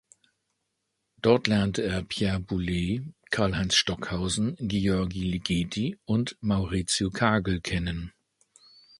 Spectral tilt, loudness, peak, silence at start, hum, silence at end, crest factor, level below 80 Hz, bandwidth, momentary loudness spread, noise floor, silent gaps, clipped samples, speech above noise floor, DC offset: -5 dB/octave; -27 LUFS; -4 dBFS; 1.25 s; none; 0.9 s; 24 dB; -44 dBFS; 11.5 kHz; 7 LU; -79 dBFS; none; under 0.1%; 53 dB; under 0.1%